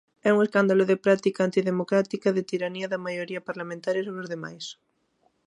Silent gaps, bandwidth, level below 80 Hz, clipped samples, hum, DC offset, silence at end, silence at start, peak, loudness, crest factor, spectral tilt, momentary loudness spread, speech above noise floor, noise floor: none; 10.5 kHz; -76 dBFS; under 0.1%; none; under 0.1%; 0.75 s; 0.25 s; -8 dBFS; -25 LUFS; 18 dB; -6.5 dB/octave; 13 LU; 44 dB; -69 dBFS